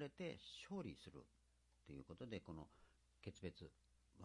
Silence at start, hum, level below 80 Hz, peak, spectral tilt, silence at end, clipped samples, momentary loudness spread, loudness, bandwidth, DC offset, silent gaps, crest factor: 0 s; none; -74 dBFS; -36 dBFS; -6 dB/octave; 0 s; under 0.1%; 11 LU; -56 LUFS; 11 kHz; under 0.1%; none; 20 dB